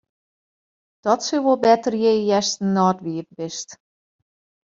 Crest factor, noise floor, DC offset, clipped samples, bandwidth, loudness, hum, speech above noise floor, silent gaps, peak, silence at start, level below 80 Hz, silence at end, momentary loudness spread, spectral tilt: 18 dB; under -90 dBFS; under 0.1%; under 0.1%; 7.8 kHz; -20 LUFS; none; over 70 dB; none; -4 dBFS; 1.05 s; -66 dBFS; 0.9 s; 13 LU; -4.5 dB/octave